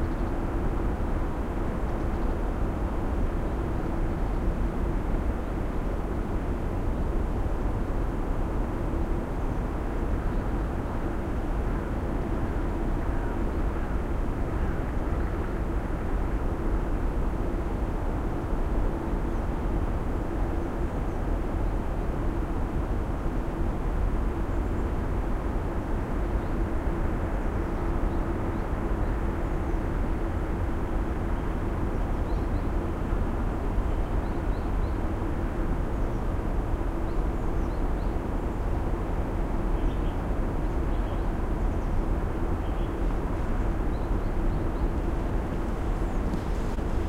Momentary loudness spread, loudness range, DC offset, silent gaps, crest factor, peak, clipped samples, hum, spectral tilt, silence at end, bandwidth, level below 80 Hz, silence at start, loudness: 1 LU; 1 LU; under 0.1%; none; 12 dB; -14 dBFS; under 0.1%; none; -8.5 dB/octave; 0 s; 10 kHz; -28 dBFS; 0 s; -31 LUFS